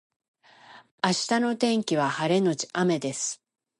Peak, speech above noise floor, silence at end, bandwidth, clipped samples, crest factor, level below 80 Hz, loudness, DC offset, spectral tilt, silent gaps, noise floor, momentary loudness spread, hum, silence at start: -6 dBFS; 27 dB; 0.45 s; 11.5 kHz; under 0.1%; 22 dB; -76 dBFS; -26 LUFS; under 0.1%; -4 dB/octave; 0.91-0.98 s; -52 dBFS; 6 LU; none; 0.7 s